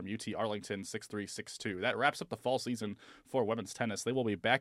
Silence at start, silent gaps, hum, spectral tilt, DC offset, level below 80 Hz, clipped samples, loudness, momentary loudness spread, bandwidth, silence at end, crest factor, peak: 0 s; none; none; -4 dB/octave; under 0.1%; -74 dBFS; under 0.1%; -36 LUFS; 10 LU; 15 kHz; 0 s; 24 dB; -12 dBFS